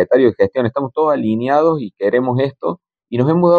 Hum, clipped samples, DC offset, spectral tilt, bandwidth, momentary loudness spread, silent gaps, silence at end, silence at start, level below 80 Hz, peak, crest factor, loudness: none; under 0.1%; under 0.1%; -9.5 dB/octave; 6.6 kHz; 10 LU; none; 0 s; 0 s; -56 dBFS; -2 dBFS; 14 dB; -16 LUFS